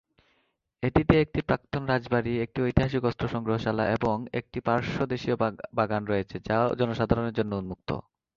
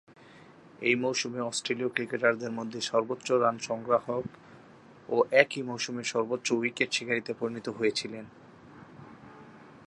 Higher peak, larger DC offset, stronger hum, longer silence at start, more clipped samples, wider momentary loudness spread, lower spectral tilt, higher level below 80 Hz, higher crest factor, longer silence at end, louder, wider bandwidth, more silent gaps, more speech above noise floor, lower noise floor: about the same, -4 dBFS vs -2 dBFS; neither; neither; first, 0.8 s vs 0.1 s; neither; second, 7 LU vs 17 LU; first, -8 dB/octave vs -3.5 dB/octave; first, -46 dBFS vs -74 dBFS; about the same, 24 dB vs 28 dB; first, 0.35 s vs 0.05 s; about the same, -28 LUFS vs -29 LUFS; second, 7.2 kHz vs 11.5 kHz; neither; first, 46 dB vs 24 dB; first, -73 dBFS vs -53 dBFS